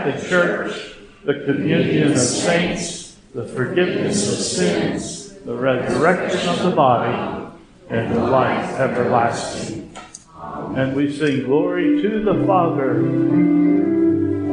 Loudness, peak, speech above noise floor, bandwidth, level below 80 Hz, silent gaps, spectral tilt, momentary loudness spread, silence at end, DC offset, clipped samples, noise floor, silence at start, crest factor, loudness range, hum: -19 LUFS; -2 dBFS; 21 dB; 10 kHz; -50 dBFS; none; -5 dB/octave; 14 LU; 0 s; under 0.1%; under 0.1%; -39 dBFS; 0 s; 18 dB; 4 LU; none